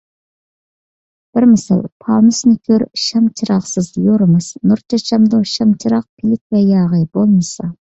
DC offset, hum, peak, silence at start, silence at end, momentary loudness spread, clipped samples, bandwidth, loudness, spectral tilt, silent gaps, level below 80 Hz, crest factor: under 0.1%; none; -2 dBFS; 1.35 s; 0.2 s; 6 LU; under 0.1%; 8.2 kHz; -14 LUFS; -6.5 dB/octave; 1.92-2.00 s, 6.09-6.17 s, 6.41-6.50 s; -52 dBFS; 12 dB